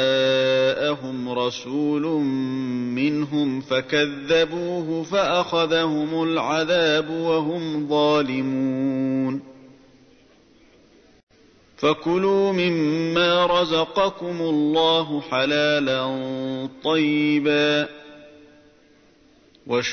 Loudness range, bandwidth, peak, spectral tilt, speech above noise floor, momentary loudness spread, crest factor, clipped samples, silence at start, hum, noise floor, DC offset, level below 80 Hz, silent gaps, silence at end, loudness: 5 LU; 6.6 kHz; -8 dBFS; -5.5 dB/octave; 34 dB; 7 LU; 14 dB; under 0.1%; 0 s; none; -55 dBFS; under 0.1%; -60 dBFS; 11.23-11.27 s; 0 s; -22 LUFS